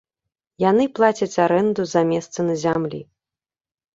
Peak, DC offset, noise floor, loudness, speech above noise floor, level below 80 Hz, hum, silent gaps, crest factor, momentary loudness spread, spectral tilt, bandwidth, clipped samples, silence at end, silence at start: -2 dBFS; under 0.1%; under -90 dBFS; -20 LUFS; over 71 dB; -60 dBFS; none; none; 18 dB; 6 LU; -6 dB/octave; 7.8 kHz; under 0.1%; 0.9 s; 0.6 s